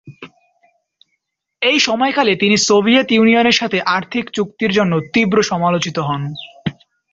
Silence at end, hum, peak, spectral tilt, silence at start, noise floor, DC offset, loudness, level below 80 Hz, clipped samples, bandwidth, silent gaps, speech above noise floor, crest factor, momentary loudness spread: 0.4 s; none; -2 dBFS; -4 dB/octave; 0.05 s; -72 dBFS; under 0.1%; -15 LUFS; -56 dBFS; under 0.1%; 7.8 kHz; none; 57 dB; 14 dB; 11 LU